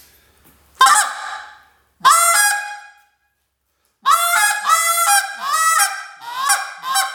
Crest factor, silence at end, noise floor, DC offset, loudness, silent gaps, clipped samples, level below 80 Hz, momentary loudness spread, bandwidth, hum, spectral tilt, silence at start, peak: 18 dB; 0 s; -69 dBFS; under 0.1%; -15 LUFS; none; under 0.1%; -68 dBFS; 18 LU; over 20 kHz; none; 3.5 dB/octave; 0.8 s; -2 dBFS